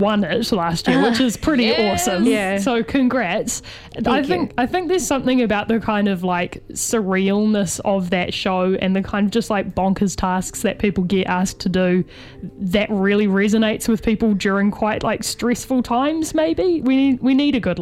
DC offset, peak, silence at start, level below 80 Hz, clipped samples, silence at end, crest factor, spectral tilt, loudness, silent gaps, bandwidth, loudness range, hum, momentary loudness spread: under 0.1%; -4 dBFS; 0 s; -42 dBFS; under 0.1%; 0 s; 14 dB; -5 dB/octave; -19 LUFS; none; 15.5 kHz; 2 LU; none; 5 LU